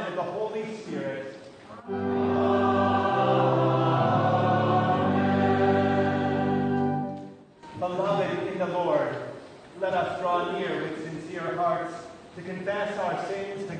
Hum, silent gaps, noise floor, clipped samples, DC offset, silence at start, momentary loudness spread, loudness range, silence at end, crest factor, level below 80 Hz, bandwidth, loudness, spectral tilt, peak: none; none; -46 dBFS; under 0.1%; under 0.1%; 0 s; 15 LU; 7 LU; 0 s; 16 dB; -66 dBFS; 9.4 kHz; -26 LUFS; -7.5 dB/octave; -12 dBFS